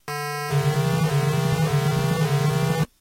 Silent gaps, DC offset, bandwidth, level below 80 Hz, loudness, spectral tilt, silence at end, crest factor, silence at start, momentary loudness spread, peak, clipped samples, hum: none; under 0.1%; 16 kHz; -48 dBFS; -22 LUFS; -6 dB/octave; 0.15 s; 12 dB; 0.05 s; 3 LU; -10 dBFS; under 0.1%; none